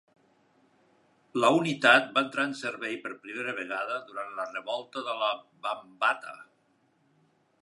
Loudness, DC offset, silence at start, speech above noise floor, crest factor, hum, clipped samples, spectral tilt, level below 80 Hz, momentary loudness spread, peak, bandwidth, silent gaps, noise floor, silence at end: -28 LUFS; under 0.1%; 1.35 s; 40 dB; 24 dB; none; under 0.1%; -4 dB/octave; -84 dBFS; 14 LU; -6 dBFS; 11.5 kHz; none; -69 dBFS; 1.2 s